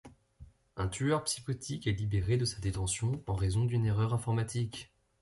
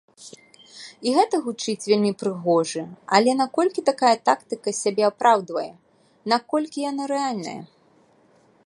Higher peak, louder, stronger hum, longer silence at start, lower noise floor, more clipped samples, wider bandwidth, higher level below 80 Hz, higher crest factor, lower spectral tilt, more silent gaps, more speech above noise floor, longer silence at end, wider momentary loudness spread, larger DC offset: second, -18 dBFS vs -2 dBFS; second, -33 LUFS vs -22 LUFS; neither; second, 0.05 s vs 0.2 s; about the same, -57 dBFS vs -58 dBFS; neither; about the same, 11.5 kHz vs 11.5 kHz; first, -48 dBFS vs -76 dBFS; second, 14 dB vs 22 dB; first, -5.5 dB/octave vs -4 dB/octave; neither; second, 25 dB vs 36 dB; second, 0.35 s vs 1 s; second, 7 LU vs 14 LU; neither